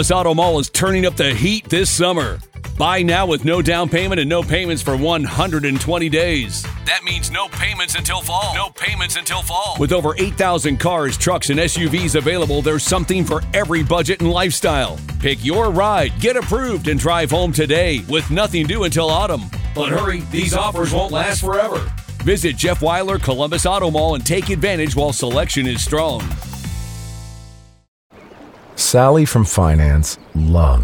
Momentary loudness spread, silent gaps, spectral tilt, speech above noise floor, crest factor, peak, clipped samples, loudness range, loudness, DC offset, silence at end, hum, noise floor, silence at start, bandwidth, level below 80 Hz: 6 LU; 27.88-28.10 s; -4.5 dB/octave; 24 dB; 16 dB; 0 dBFS; under 0.1%; 3 LU; -17 LUFS; under 0.1%; 0 s; none; -40 dBFS; 0 s; 19.5 kHz; -26 dBFS